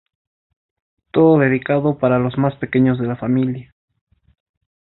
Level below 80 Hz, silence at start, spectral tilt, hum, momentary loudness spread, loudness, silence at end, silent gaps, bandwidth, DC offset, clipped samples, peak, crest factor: -54 dBFS; 1.15 s; -13 dB/octave; none; 9 LU; -17 LUFS; 1.25 s; none; 4.1 kHz; under 0.1%; under 0.1%; -2 dBFS; 18 dB